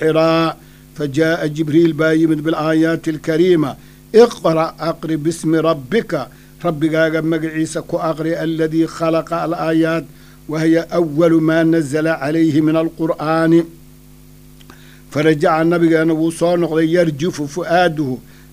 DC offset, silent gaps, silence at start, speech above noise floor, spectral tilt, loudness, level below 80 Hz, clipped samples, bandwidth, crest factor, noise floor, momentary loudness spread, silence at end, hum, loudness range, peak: under 0.1%; none; 0 s; 27 dB; -6.5 dB/octave; -16 LUFS; -48 dBFS; under 0.1%; 15.5 kHz; 16 dB; -42 dBFS; 9 LU; 0.3 s; none; 3 LU; 0 dBFS